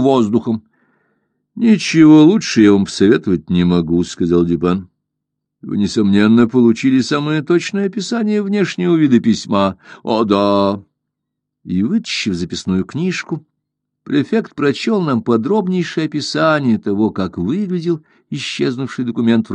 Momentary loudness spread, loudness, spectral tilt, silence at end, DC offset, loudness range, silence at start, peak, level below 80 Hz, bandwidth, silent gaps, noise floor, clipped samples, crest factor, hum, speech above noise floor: 10 LU; -15 LUFS; -6 dB/octave; 0 s; under 0.1%; 7 LU; 0 s; 0 dBFS; -50 dBFS; 9.4 kHz; none; -77 dBFS; under 0.1%; 14 dB; none; 63 dB